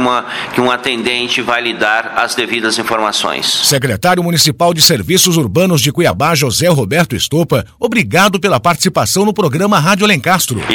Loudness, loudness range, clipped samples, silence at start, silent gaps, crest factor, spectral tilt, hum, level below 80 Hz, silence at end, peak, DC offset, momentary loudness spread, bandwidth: -12 LUFS; 3 LU; under 0.1%; 0 s; none; 12 dB; -3.5 dB/octave; none; -44 dBFS; 0 s; 0 dBFS; under 0.1%; 5 LU; 19.5 kHz